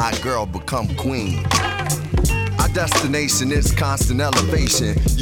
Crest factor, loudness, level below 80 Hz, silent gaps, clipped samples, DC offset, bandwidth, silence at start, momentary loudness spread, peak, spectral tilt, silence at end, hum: 16 dB; -19 LUFS; -26 dBFS; none; under 0.1%; under 0.1%; 19 kHz; 0 s; 5 LU; -4 dBFS; -4 dB/octave; 0 s; none